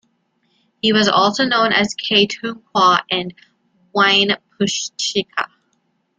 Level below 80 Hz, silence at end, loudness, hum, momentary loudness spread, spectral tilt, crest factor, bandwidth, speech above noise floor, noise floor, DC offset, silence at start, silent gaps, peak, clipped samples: -60 dBFS; 0.75 s; -16 LUFS; none; 11 LU; -3 dB/octave; 18 dB; 9.4 kHz; 49 dB; -66 dBFS; under 0.1%; 0.85 s; none; 0 dBFS; under 0.1%